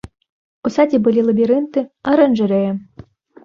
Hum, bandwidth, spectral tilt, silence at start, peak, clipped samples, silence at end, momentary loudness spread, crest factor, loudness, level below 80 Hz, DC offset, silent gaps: none; 7.2 kHz; -8 dB/octave; 0.65 s; -2 dBFS; under 0.1%; 0.6 s; 9 LU; 16 dB; -16 LUFS; -54 dBFS; under 0.1%; none